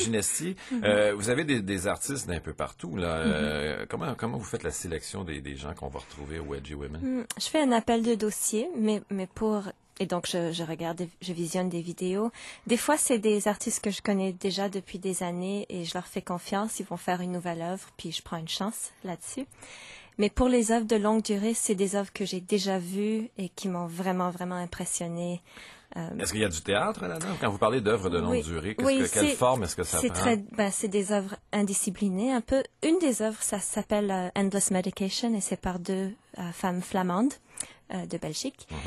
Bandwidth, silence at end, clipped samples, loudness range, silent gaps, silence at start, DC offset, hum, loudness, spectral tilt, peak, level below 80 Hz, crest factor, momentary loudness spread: 13 kHz; 0 s; under 0.1%; 6 LU; none; 0 s; under 0.1%; none; -29 LUFS; -4 dB/octave; -10 dBFS; -50 dBFS; 18 dB; 12 LU